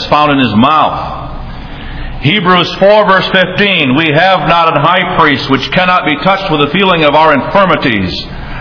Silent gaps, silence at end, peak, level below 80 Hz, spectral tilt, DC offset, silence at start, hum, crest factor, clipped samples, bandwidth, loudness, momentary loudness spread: none; 0 s; 0 dBFS; -30 dBFS; -6.5 dB/octave; under 0.1%; 0 s; none; 10 dB; 1%; 5.4 kHz; -8 LUFS; 15 LU